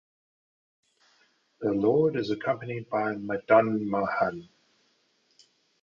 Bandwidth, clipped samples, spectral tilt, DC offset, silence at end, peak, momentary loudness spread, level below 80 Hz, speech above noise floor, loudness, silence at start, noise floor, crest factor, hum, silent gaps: 7.2 kHz; under 0.1%; -8 dB/octave; under 0.1%; 1.4 s; -8 dBFS; 10 LU; -66 dBFS; 43 dB; -27 LUFS; 1.6 s; -69 dBFS; 22 dB; none; none